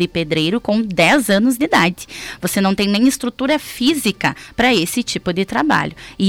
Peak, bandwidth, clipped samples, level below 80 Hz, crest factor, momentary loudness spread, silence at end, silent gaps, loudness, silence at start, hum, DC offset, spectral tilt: -4 dBFS; 17.5 kHz; under 0.1%; -46 dBFS; 12 dB; 7 LU; 0 s; none; -16 LUFS; 0 s; none; under 0.1%; -4.5 dB/octave